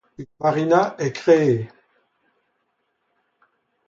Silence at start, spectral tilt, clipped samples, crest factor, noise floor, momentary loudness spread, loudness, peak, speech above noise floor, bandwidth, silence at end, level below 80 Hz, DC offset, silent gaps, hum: 0.2 s; -7 dB/octave; under 0.1%; 20 dB; -72 dBFS; 13 LU; -20 LUFS; -2 dBFS; 53 dB; 7.6 kHz; 2.2 s; -66 dBFS; under 0.1%; none; none